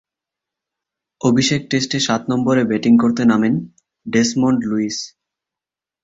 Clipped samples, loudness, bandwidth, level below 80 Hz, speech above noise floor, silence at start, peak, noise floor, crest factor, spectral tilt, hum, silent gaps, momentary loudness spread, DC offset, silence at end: under 0.1%; -17 LUFS; 8 kHz; -56 dBFS; 72 dB; 1.25 s; -2 dBFS; -88 dBFS; 16 dB; -5 dB/octave; none; none; 10 LU; under 0.1%; 0.95 s